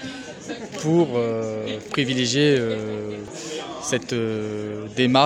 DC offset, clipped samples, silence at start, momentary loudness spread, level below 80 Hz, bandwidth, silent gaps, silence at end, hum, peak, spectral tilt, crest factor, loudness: under 0.1%; under 0.1%; 0 s; 14 LU; -60 dBFS; 13 kHz; none; 0 s; none; -2 dBFS; -4.5 dB/octave; 20 dB; -24 LUFS